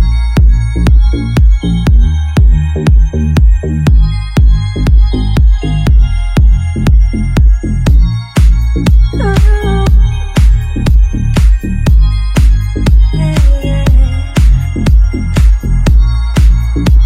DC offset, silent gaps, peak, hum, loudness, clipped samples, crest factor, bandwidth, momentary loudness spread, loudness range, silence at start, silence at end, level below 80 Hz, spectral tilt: under 0.1%; none; 0 dBFS; none; -11 LUFS; 0.4%; 8 dB; 10 kHz; 2 LU; 1 LU; 0 s; 0 s; -8 dBFS; -7 dB/octave